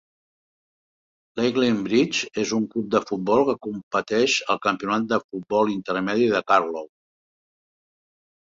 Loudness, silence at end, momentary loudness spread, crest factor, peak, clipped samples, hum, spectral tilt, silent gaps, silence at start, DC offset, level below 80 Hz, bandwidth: -23 LUFS; 1.6 s; 6 LU; 20 dB; -4 dBFS; under 0.1%; none; -4.5 dB/octave; 3.83-3.91 s, 5.24-5.29 s; 1.35 s; under 0.1%; -64 dBFS; 7.8 kHz